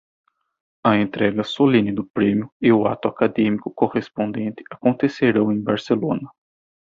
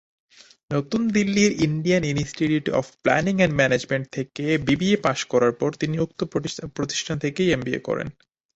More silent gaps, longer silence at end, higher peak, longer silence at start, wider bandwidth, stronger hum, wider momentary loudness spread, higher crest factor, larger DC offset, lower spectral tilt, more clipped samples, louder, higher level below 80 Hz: first, 2.10-2.14 s, 2.52-2.60 s vs none; first, 0.6 s vs 0.45 s; about the same, -2 dBFS vs -4 dBFS; first, 0.85 s vs 0.7 s; second, 7.4 kHz vs 8.2 kHz; neither; about the same, 8 LU vs 9 LU; about the same, 18 dB vs 20 dB; neither; first, -8 dB/octave vs -5.5 dB/octave; neither; first, -20 LUFS vs -23 LUFS; second, -58 dBFS vs -52 dBFS